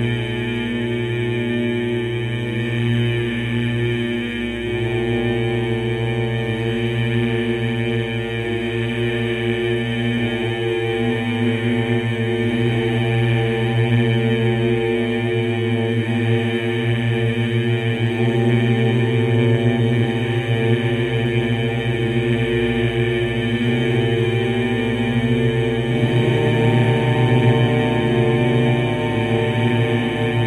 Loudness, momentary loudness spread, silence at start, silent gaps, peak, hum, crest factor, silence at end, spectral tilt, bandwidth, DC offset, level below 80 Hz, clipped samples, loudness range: -19 LUFS; 5 LU; 0 s; none; -4 dBFS; 60 Hz at -40 dBFS; 16 dB; 0 s; -7.5 dB/octave; 11 kHz; under 0.1%; -42 dBFS; under 0.1%; 4 LU